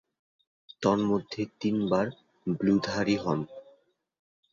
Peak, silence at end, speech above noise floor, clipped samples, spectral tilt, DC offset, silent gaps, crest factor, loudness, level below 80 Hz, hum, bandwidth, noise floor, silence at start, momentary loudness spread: -10 dBFS; 0.9 s; 37 dB; under 0.1%; -6.5 dB/octave; under 0.1%; none; 20 dB; -29 LUFS; -62 dBFS; none; 7.4 kHz; -64 dBFS; 0.8 s; 9 LU